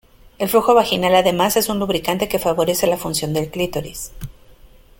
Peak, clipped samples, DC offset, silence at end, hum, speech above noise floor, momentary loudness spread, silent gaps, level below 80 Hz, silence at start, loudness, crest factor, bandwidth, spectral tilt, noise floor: -2 dBFS; under 0.1%; under 0.1%; 0.7 s; none; 28 dB; 15 LU; none; -44 dBFS; 0.4 s; -18 LUFS; 18 dB; 17 kHz; -4 dB/octave; -46 dBFS